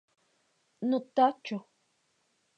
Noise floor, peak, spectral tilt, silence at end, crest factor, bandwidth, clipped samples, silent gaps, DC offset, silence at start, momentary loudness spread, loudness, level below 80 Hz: -74 dBFS; -12 dBFS; -6.5 dB/octave; 1 s; 22 dB; 8 kHz; under 0.1%; none; under 0.1%; 0.8 s; 13 LU; -30 LUFS; -88 dBFS